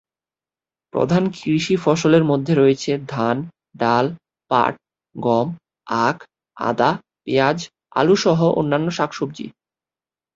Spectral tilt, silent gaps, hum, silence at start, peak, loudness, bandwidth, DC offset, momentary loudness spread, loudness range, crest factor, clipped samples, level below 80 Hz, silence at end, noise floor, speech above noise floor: -6 dB/octave; none; none; 0.95 s; -2 dBFS; -19 LUFS; 8 kHz; under 0.1%; 12 LU; 3 LU; 18 dB; under 0.1%; -58 dBFS; 0.85 s; under -90 dBFS; over 72 dB